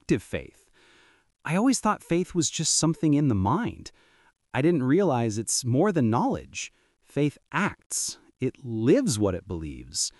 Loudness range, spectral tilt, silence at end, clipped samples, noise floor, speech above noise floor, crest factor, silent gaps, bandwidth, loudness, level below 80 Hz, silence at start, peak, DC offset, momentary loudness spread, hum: 3 LU; -4.5 dB/octave; 0.1 s; under 0.1%; -60 dBFS; 34 dB; 16 dB; 7.86-7.90 s; 12 kHz; -26 LUFS; -54 dBFS; 0.1 s; -10 dBFS; under 0.1%; 13 LU; none